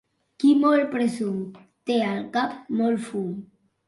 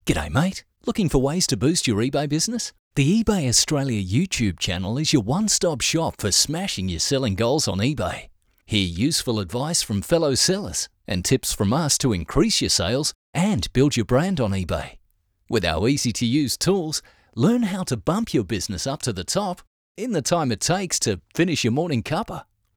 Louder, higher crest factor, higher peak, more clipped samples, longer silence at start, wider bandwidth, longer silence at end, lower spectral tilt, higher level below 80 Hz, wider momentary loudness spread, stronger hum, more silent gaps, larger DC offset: about the same, -24 LUFS vs -22 LUFS; about the same, 16 dB vs 18 dB; second, -8 dBFS vs -4 dBFS; neither; first, 0.4 s vs 0.05 s; second, 11.5 kHz vs over 20 kHz; about the same, 0.45 s vs 0.35 s; first, -6.5 dB/octave vs -4 dB/octave; second, -70 dBFS vs -42 dBFS; first, 14 LU vs 8 LU; neither; second, none vs 2.79-2.91 s, 13.15-13.33 s, 19.67-19.95 s; neither